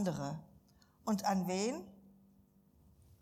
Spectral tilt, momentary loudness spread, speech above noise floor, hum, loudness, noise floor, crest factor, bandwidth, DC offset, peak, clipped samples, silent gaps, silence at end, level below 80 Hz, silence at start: -5.5 dB/octave; 14 LU; 31 dB; none; -38 LUFS; -67 dBFS; 18 dB; 16 kHz; under 0.1%; -22 dBFS; under 0.1%; none; 1.25 s; -70 dBFS; 0 s